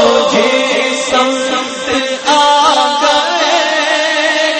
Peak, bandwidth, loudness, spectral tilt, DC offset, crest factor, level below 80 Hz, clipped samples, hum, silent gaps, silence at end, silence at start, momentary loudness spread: 0 dBFS; 8.8 kHz; -11 LUFS; -1.5 dB/octave; under 0.1%; 12 dB; -52 dBFS; under 0.1%; none; none; 0 s; 0 s; 6 LU